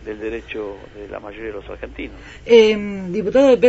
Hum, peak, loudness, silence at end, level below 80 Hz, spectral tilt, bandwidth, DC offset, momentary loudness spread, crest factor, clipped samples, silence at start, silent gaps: none; 0 dBFS; -17 LUFS; 0 s; -42 dBFS; -5.5 dB/octave; 8 kHz; under 0.1%; 21 LU; 18 dB; under 0.1%; 0 s; none